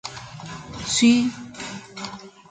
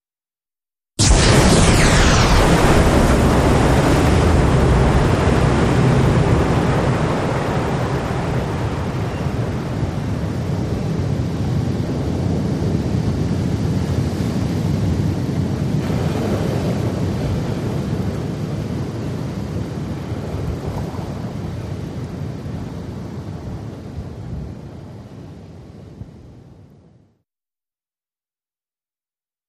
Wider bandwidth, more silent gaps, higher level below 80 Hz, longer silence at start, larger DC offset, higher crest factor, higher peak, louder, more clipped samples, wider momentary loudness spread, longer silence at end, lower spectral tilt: second, 9.4 kHz vs 15 kHz; neither; second, -54 dBFS vs -26 dBFS; second, 0.05 s vs 1 s; neither; about the same, 20 dB vs 18 dB; second, -6 dBFS vs -2 dBFS; about the same, -20 LUFS vs -18 LUFS; neither; first, 20 LU vs 17 LU; second, 0.2 s vs 2.95 s; second, -3 dB/octave vs -5.5 dB/octave